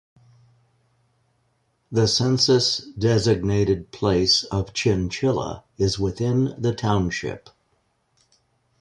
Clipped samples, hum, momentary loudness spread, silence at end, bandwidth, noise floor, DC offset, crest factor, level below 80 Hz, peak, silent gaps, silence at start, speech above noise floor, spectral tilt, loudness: under 0.1%; none; 9 LU; 1.4 s; 11 kHz; -68 dBFS; under 0.1%; 18 dB; -44 dBFS; -6 dBFS; none; 1.9 s; 47 dB; -5 dB/octave; -22 LUFS